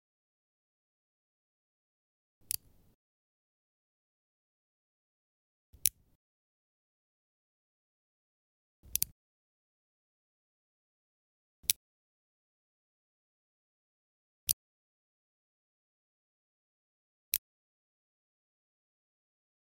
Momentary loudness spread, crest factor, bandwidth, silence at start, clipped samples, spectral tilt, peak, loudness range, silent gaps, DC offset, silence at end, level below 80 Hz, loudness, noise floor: 6 LU; 44 dB; 16.5 kHz; 5.85 s; under 0.1%; 1.5 dB/octave; -4 dBFS; 6 LU; 6.15-8.83 s, 9.12-11.63 s, 11.76-14.47 s, 14.53-17.32 s; under 0.1%; 2.25 s; -72 dBFS; -35 LUFS; under -90 dBFS